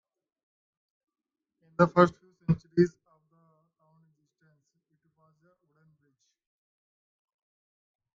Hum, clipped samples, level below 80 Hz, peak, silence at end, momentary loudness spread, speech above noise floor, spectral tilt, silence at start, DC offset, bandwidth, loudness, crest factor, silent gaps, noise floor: none; under 0.1%; -66 dBFS; -4 dBFS; 5.3 s; 14 LU; 51 dB; -8.5 dB/octave; 1.8 s; under 0.1%; 7.4 kHz; -26 LUFS; 28 dB; none; -76 dBFS